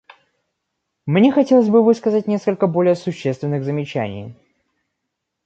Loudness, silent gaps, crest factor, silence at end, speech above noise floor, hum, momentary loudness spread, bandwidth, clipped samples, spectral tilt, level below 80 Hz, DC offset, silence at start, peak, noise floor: -17 LUFS; none; 16 dB; 1.15 s; 61 dB; none; 13 LU; 8 kHz; under 0.1%; -8 dB/octave; -60 dBFS; under 0.1%; 1.05 s; -2 dBFS; -78 dBFS